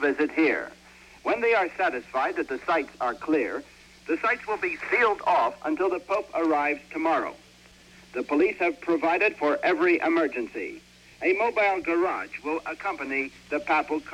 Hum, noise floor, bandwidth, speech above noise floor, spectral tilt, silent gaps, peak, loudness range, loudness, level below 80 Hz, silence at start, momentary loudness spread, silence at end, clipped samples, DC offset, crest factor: none; -53 dBFS; 11 kHz; 27 dB; -4.5 dB/octave; none; -10 dBFS; 3 LU; -26 LUFS; -62 dBFS; 0 s; 9 LU; 0 s; under 0.1%; under 0.1%; 16 dB